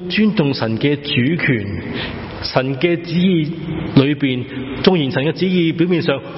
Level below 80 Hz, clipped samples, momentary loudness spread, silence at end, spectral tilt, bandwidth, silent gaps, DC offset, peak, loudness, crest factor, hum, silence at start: -42 dBFS; under 0.1%; 9 LU; 0 s; -9.5 dB/octave; 6 kHz; none; under 0.1%; 0 dBFS; -17 LUFS; 16 dB; none; 0 s